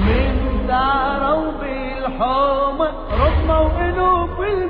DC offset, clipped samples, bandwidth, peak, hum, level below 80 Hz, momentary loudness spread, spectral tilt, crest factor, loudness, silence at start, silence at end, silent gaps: under 0.1%; under 0.1%; 5.2 kHz; -4 dBFS; none; -24 dBFS; 7 LU; -10 dB/octave; 14 dB; -19 LUFS; 0 s; 0 s; none